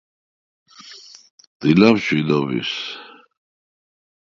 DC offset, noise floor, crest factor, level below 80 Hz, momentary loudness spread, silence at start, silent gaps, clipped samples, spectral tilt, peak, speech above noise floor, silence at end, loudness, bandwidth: under 0.1%; -43 dBFS; 22 dB; -58 dBFS; 25 LU; 0.85 s; 1.30-1.38 s, 1.47-1.60 s; under 0.1%; -6.5 dB/octave; 0 dBFS; 26 dB; 1.25 s; -18 LUFS; 7.4 kHz